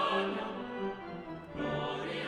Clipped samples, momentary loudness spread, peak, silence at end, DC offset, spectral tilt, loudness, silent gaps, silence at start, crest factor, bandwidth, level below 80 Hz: under 0.1%; 11 LU; -20 dBFS; 0 s; under 0.1%; -6 dB/octave; -37 LUFS; none; 0 s; 16 dB; 11 kHz; -62 dBFS